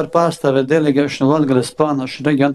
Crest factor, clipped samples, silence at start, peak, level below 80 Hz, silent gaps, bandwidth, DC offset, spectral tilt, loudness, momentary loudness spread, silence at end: 16 dB; under 0.1%; 0 s; 0 dBFS; -58 dBFS; none; 12.5 kHz; under 0.1%; -6.5 dB/octave; -16 LUFS; 4 LU; 0 s